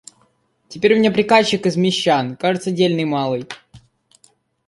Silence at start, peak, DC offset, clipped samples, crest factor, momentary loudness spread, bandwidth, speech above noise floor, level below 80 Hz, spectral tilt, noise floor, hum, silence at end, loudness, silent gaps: 0.7 s; -2 dBFS; under 0.1%; under 0.1%; 18 dB; 12 LU; 11.5 kHz; 44 dB; -60 dBFS; -5 dB/octave; -61 dBFS; none; 0.9 s; -17 LUFS; none